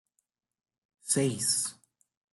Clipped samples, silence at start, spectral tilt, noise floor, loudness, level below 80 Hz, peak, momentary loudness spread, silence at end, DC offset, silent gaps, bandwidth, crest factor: under 0.1%; 1.05 s; -3 dB/octave; -80 dBFS; -28 LUFS; -74 dBFS; -14 dBFS; 10 LU; 0.6 s; under 0.1%; none; 12.5 kHz; 22 dB